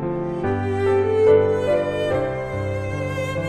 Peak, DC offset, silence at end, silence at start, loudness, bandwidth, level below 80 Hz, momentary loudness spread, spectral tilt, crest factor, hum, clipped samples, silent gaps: -6 dBFS; under 0.1%; 0 s; 0 s; -21 LUFS; 10.5 kHz; -46 dBFS; 10 LU; -7.5 dB/octave; 16 dB; none; under 0.1%; none